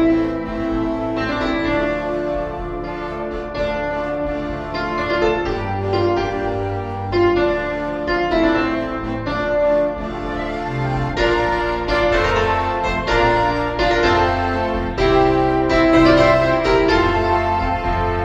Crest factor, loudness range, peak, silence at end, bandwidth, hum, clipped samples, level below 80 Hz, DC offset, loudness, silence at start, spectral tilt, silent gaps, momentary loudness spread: 16 dB; 7 LU; -2 dBFS; 0 s; 8.2 kHz; none; under 0.1%; -32 dBFS; under 0.1%; -19 LUFS; 0 s; -6.5 dB/octave; none; 9 LU